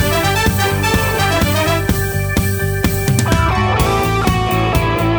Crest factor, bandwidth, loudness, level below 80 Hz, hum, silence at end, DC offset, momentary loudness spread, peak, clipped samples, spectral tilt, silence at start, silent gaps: 14 dB; over 20 kHz; -15 LUFS; -24 dBFS; none; 0 s; under 0.1%; 3 LU; 0 dBFS; under 0.1%; -5 dB/octave; 0 s; none